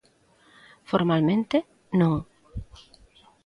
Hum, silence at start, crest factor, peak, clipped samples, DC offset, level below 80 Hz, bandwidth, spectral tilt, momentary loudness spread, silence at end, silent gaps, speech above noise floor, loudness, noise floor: none; 0.9 s; 20 dB; -8 dBFS; under 0.1%; under 0.1%; -50 dBFS; 10.5 kHz; -8.5 dB/octave; 19 LU; 0.8 s; none; 37 dB; -24 LUFS; -61 dBFS